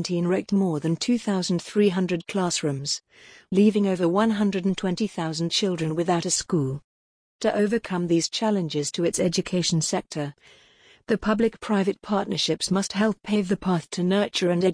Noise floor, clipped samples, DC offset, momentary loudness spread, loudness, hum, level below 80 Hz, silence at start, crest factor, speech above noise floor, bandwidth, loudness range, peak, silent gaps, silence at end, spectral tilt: under -90 dBFS; under 0.1%; under 0.1%; 5 LU; -24 LUFS; none; -56 dBFS; 0 s; 16 dB; over 66 dB; 10.5 kHz; 2 LU; -8 dBFS; 6.84-7.39 s; 0 s; -5 dB/octave